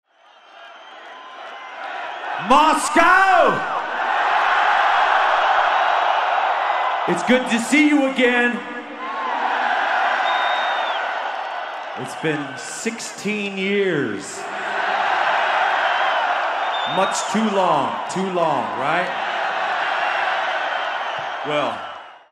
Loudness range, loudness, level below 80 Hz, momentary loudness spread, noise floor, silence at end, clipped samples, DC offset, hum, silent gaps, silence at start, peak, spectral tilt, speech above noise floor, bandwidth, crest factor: 7 LU; -19 LUFS; -60 dBFS; 13 LU; -50 dBFS; 0.15 s; under 0.1%; under 0.1%; none; none; 0.55 s; -2 dBFS; -3.5 dB/octave; 31 dB; 14 kHz; 18 dB